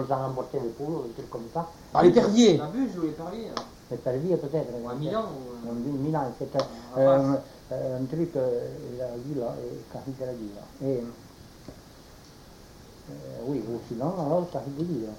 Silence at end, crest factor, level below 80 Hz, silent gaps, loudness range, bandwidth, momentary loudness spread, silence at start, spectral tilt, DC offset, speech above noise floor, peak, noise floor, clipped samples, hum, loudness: 0 s; 22 dB; -56 dBFS; none; 13 LU; 17 kHz; 18 LU; 0 s; -6.5 dB/octave; under 0.1%; 22 dB; -6 dBFS; -49 dBFS; under 0.1%; none; -28 LUFS